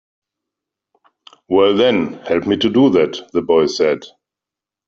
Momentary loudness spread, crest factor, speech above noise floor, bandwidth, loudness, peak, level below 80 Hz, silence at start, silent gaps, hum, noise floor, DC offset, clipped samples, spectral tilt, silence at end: 7 LU; 16 dB; 72 dB; 7.6 kHz; -16 LUFS; -2 dBFS; -56 dBFS; 1.5 s; none; none; -87 dBFS; under 0.1%; under 0.1%; -5.5 dB/octave; 0.8 s